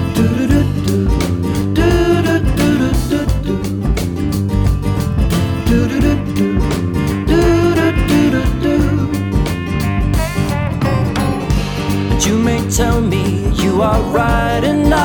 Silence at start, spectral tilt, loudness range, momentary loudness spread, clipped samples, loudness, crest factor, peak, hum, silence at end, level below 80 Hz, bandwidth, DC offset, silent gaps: 0 s; -6 dB/octave; 2 LU; 5 LU; under 0.1%; -15 LUFS; 10 dB; -2 dBFS; none; 0 s; -22 dBFS; 19.5 kHz; under 0.1%; none